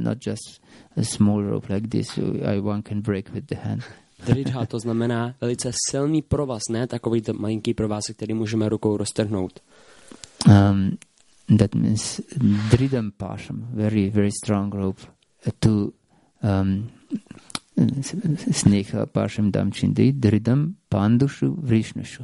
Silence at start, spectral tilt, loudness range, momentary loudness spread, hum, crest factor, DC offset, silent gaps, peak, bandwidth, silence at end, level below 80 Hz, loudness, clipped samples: 0 s; -6.5 dB/octave; 5 LU; 13 LU; none; 22 dB; under 0.1%; none; -2 dBFS; 11.5 kHz; 0 s; -48 dBFS; -23 LUFS; under 0.1%